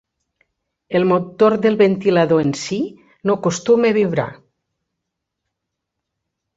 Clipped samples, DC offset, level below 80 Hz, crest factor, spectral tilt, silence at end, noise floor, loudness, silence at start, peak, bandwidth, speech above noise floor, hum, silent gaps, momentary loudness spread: under 0.1%; under 0.1%; -60 dBFS; 16 dB; -6 dB/octave; 2.25 s; -79 dBFS; -17 LUFS; 0.9 s; -2 dBFS; 8 kHz; 63 dB; none; none; 9 LU